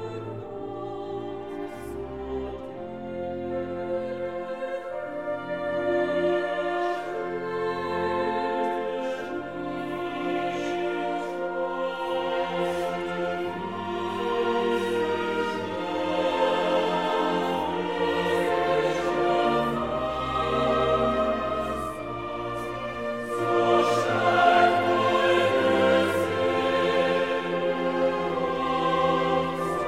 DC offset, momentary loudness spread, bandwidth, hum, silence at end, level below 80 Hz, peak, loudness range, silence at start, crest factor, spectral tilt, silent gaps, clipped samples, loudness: 0.2%; 12 LU; 15.5 kHz; none; 0 s; -52 dBFS; -6 dBFS; 10 LU; 0 s; 20 dB; -5.5 dB/octave; none; under 0.1%; -26 LUFS